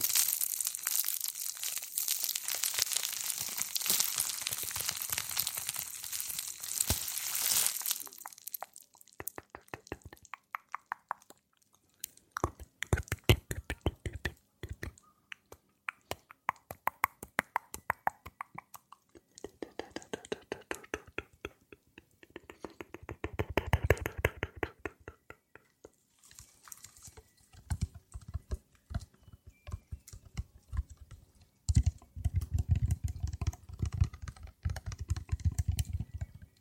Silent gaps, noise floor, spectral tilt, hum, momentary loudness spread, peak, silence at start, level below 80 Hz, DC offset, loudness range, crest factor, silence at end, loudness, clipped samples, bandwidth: none; -71 dBFS; -3 dB/octave; none; 20 LU; -4 dBFS; 0 s; -44 dBFS; under 0.1%; 14 LU; 32 dB; 0.15 s; -35 LUFS; under 0.1%; 17 kHz